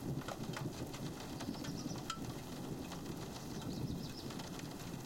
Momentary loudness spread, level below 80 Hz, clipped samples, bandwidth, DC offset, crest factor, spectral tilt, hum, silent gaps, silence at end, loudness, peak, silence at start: 3 LU; -60 dBFS; under 0.1%; 17 kHz; under 0.1%; 18 dB; -5 dB/octave; none; none; 0 s; -45 LUFS; -26 dBFS; 0 s